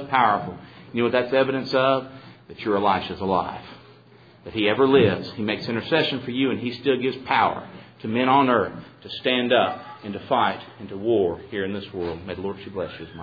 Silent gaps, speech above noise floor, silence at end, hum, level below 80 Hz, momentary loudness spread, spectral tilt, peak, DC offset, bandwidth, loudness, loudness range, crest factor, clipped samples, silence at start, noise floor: none; 28 dB; 0 s; none; -58 dBFS; 16 LU; -7.5 dB/octave; -4 dBFS; under 0.1%; 5 kHz; -23 LUFS; 3 LU; 20 dB; under 0.1%; 0 s; -51 dBFS